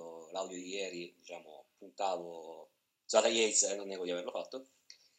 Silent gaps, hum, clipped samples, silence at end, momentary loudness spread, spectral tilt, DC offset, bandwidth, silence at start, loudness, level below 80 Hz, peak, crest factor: none; none; under 0.1%; 0.25 s; 22 LU; -1 dB/octave; under 0.1%; 15.5 kHz; 0 s; -34 LUFS; under -90 dBFS; -14 dBFS; 24 dB